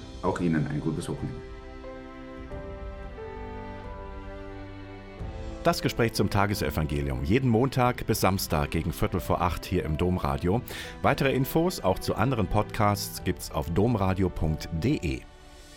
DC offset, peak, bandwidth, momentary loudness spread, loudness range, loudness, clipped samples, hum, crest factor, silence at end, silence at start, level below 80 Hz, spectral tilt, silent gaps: under 0.1%; -10 dBFS; 17 kHz; 16 LU; 14 LU; -27 LUFS; under 0.1%; none; 18 dB; 0 s; 0 s; -40 dBFS; -6 dB/octave; none